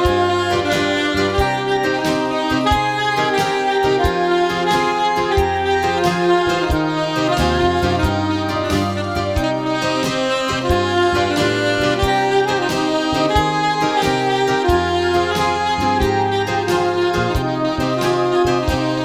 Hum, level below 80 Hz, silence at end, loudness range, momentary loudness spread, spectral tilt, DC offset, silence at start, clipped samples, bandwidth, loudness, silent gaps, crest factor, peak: none; -32 dBFS; 0 s; 2 LU; 3 LU; -5 dB/octave; 0.2%; 0 s; under 0.1%; 16 kHz; -17 LUFS; none; 14 dB; -2 dBFS